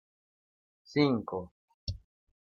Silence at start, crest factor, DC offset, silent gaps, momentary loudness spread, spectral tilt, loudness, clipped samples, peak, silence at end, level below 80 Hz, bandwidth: 0.9 s; 22 dB; under 0.1%; 1.51-1.68 s, 1.74-1.87 s; 18 LU; -7.5 dB/octave; -32 LUFS; under 0.1%; -14 dBFS; 0.65 s; -56 dBFS; 7.2 kHz